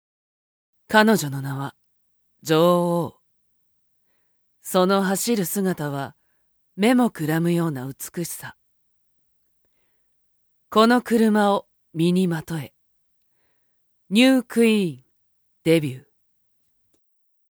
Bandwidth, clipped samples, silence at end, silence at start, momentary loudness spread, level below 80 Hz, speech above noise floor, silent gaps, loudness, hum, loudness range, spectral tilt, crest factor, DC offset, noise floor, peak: over 20 kHz; under 0.1%; 1.5 s; 0.9 s; 16 LU; -68 dBFS; 44 dB; none; -21 LUFS; none; 4 LU; -5.5 dB/octave; 22 dB; under 0.1%; -64 dBFS; 0 dBFS